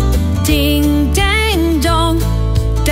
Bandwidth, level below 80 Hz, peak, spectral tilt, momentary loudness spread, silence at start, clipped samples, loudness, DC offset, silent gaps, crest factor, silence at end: 16.5 kHz; -16 dBFS; 0 dBFS; -5 dB/octave; 3 LU; 0 s; under 0.1%; -14 LUFS; under 0.1%; none; 12 dB; 0 s